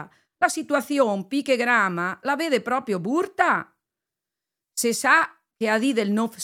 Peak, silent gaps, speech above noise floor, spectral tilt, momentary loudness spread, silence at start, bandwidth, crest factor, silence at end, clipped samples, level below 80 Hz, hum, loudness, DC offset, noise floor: -4 dBFS; none; 64 dB; -3.5 dB/octave; 7 LU; 0 s; 17 kHz; 20 dB; 0 s; under 0.1%; -78 dBFS; none; -23 LUFS; under 0.1%; -87 dBFS